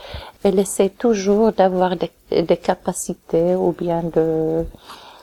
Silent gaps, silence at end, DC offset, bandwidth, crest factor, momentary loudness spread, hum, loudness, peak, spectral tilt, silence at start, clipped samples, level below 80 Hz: none; 0.15 s; under 0.1%; 17 kHz; 16 dB; 10 LU; none; -19 LUFS; -2 dBFS; -6 dB/octave; 0 s; under 0.1%; -44 dBFS